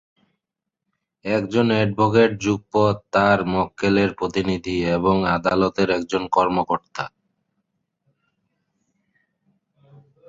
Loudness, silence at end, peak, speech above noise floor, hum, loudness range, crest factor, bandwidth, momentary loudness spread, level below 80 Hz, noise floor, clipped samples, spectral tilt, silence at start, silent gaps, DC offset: -20 LUFS; 3.2 s; -2 dBFS; 64 dB; none; 8 LU; 20 dB; 7.8 kHz; 7 LU; -50 dBFS; -84 dBFS; under 0.1%; -6.5 dB/octave; 1.25 s; none; under 0.1%